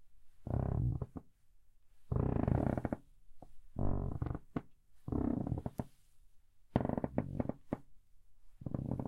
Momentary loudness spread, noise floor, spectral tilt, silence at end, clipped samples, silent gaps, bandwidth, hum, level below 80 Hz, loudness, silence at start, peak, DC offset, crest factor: 13 LU; -61 dBFS; -10.5 dB/octave; 0 s; under 0.1%; none; 4.5 kHz; none; -48 dBFS; -39 LUFS; 0 s; -14 dBFS; under 0.1%; 26 dB